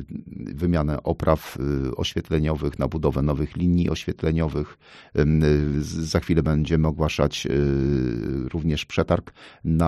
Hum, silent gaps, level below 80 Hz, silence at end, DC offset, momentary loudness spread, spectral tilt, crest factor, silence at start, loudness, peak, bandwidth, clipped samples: none; none; -34 dBFS; 0 s; under 0.1%; 6 LU; -7 dB/octave; 18 dB; 0 s; -24 LUFS; -4 dBFS; 13.5 kHz; under 0.1%